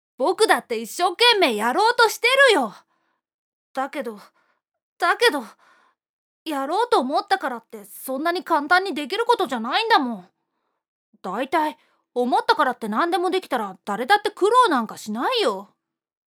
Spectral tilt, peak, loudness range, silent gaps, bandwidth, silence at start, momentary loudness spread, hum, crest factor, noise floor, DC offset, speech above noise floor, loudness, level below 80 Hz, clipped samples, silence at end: -2.5 dB/octave; -2 dBFS; 6 LU; 3.34-3.74 s, 4.82-4.96 s, 6.09-6.46 s, 10.88-11.13 s; 19.5 kHz; 0.2 s; 14 LU; none; 20 dB; -76 dBFS; under 0.1%; 55 dB; -21 LUFS; -84 dBFS; under 0.1%; 0.65 s